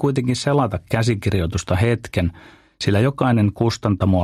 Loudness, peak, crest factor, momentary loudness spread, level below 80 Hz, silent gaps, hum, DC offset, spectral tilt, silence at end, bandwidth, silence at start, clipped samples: -20 LUFS; -2 dBFS; 16 dB; 5 LU; -40 dBFS; none; none; under 0.1%; -6.5 dB/octave; 0 s; 14 kHz; 0 s; under 0.1%